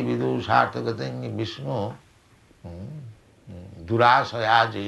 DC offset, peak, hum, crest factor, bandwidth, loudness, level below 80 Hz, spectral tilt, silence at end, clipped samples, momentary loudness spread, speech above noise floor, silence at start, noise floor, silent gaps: under 0.1%; -2 dBFS; none; 22 dB; 12 kHz; -23 LUFS; -58 dBFS; -6 dB/octave; 0 s; under 0.1%; 23 LU; 33 dB; 0 s; -56 dBFS; none